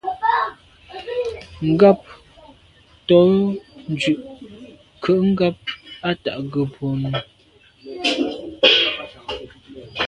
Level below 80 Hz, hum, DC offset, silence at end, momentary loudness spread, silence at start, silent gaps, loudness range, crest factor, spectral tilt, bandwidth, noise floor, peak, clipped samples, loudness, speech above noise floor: -52 dBFS; none; under 0.1%; 0 s; 20 LU; 0.05 s; none; 4 LU; 20 dB; -6 dB/octave; 11 kHz; -53 dBFS; 0 dBFS; under 0.1%; -19 LUFS; 36 dB